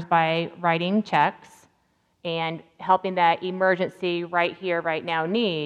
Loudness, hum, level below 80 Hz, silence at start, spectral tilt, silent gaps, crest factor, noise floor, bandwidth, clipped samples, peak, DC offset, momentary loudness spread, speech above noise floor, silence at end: -24 LUFS; none; -76 dBFS; 0 s; -6.5 dB/octave; none; 18 dB; -68 dBFS; 10.5 kHz; under 0.1%; -6 dBFS; under 0.1%; 7 LU; 44 dB; 0 s